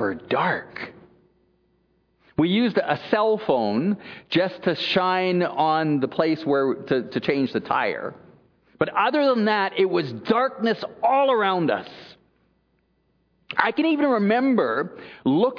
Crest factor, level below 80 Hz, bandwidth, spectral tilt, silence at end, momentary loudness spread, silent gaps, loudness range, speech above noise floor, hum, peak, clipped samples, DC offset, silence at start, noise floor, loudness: 20 dB; -64 dBFS; 5.4 kHz; -7.5 dB/octave; 0 s; 8 LU; none; 3 LU; 45 dB; none; -2 dBFS; under 0.1%; under 0.1%; 0 s; -67 dBFS; -22 LUFS